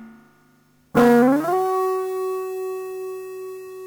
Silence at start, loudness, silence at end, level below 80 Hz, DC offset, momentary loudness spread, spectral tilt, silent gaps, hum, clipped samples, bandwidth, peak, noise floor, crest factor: 0 s; -21 LUFS; 0 s; -60 dBFS; under 0.1%; 18 LU; -6.5 dB/octave; none; 50 Hz at -50 dBFS; under 0.1%; over 20 kHz; -4 dBFS; -58 dBFS; 18 dB